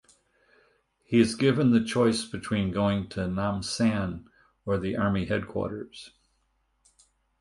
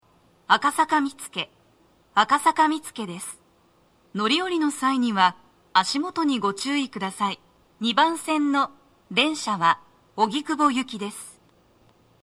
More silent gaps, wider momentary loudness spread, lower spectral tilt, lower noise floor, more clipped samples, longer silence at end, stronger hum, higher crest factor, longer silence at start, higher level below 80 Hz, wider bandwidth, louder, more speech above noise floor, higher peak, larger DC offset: neither; about the same, 12 LU vs 13 LU; first, -6 dB/octave vs -3 dB/octave; first, -72 dBFS vs -61 dBFS; neither; first, 1.35 s vs 0.95 s; neither; about the same, 20 dB vs 22 dB; first, 1.1 s vs 0.5 s; first, -52 dBFS vs -70 dBFS; second, 11.5 kHz vs 14 kHz; second, -27 LUFS vs -23 LUFS; first, 46 dB vs 38 dB; second, -8 dBFS vs -2 dBFS; neither